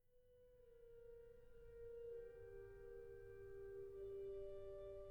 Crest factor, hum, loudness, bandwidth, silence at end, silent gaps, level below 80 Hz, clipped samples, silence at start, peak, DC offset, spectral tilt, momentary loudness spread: 12 dB; none; -57 LUFS; 19.5 kHz; 0 s; none; -68 dBFS; under 0.1%; 0.05 s; -44 dBFS; under 0.1%; -7.5 dB/octave; 12 LU